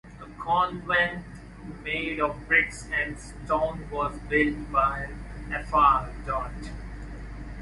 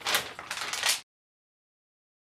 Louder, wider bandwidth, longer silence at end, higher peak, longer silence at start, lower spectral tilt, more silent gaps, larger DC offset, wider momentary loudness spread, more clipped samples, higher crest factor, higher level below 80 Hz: first, -26 LUFS vs -29 LUFS; second, 11.5 kHz vs 16 kHz; second, 0 s vs 1.25 s; about the same, -8 dBFS vs -10 dBFS; about the same, 0.05 s vs 0 s; first, -5 dB/octave vs 1 dB/octave; neither; neither; first, 19 LU vs 8 LU; neither; about the same, 20 dB vs 24 dB; first, -42 dBFS vs -72 dBFS